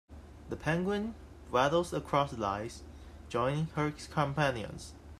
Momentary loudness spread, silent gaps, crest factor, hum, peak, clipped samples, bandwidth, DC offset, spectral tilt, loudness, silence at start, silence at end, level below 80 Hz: 20 LU; none; 20 dB; none; -14 dBFS; under 0.1%; 14 kHz; under 0.1%; -6 dB/octave; -33 LUFS; 0.1 s; 0.05 s; -54 dBFS